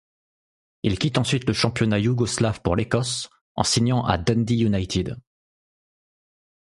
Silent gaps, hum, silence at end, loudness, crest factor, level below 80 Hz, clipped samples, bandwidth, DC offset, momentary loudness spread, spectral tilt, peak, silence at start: 3.41-3.55 s; none; 1.45 s; -23 LUFS; 22 dB; -44 dBFS; under 0.1%; 11.5 kHz; under 0.1%; 7 LU; -5 dB/octave; -2 dBFS; 0.85 s